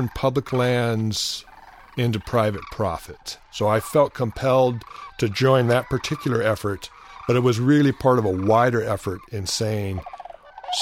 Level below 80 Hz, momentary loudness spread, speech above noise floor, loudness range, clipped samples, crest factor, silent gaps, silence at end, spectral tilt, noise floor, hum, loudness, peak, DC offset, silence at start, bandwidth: -48 dBFS; 15 LU; 19 dB; 4 LU; under 0.1%; 18 dB; none; 0 s; -5.5 dB/octave; -40 dBFS; none; -22 LUFS; -4 dBFS; under 0.1%; 0 s; 16.5 kHz